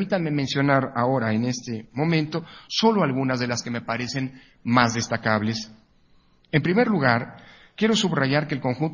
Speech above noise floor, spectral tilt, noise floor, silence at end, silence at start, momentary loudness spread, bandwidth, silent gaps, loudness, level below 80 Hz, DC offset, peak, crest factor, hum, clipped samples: 35 dB; -5.5 dB/octave; -58 dBFS; 0 s; 0 s; 11 LU; 7.4 kHz; none; -23 LUFS; -58 dBFS; under 0.1%; -2 dBFS; 22 dB; none; under 0.1%